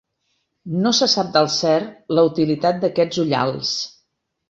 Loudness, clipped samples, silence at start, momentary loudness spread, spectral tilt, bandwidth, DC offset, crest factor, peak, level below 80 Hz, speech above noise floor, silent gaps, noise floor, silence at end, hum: -19 LUFS; under 0.1%; 0.65 s; 7 LU; -4.5 dB/octave; 8 kHz; under 0.1%; 18 dB; -2 dBFS; -62 dBFS; 52 dB; none; -71 dBFS; 0.6 s; none